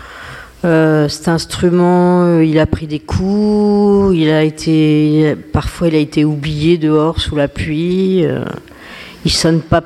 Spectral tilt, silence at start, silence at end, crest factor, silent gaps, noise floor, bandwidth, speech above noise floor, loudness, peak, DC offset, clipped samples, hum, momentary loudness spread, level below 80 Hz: -6.5 dB/octave; 0 s; 0 s; 12 dB; none; -33 dBFS; 13 kHz; 21 dB; -13 LUFS; 0 dBFS; under 0.1%; under 0.1%; none; 10 LU; -32 dBFS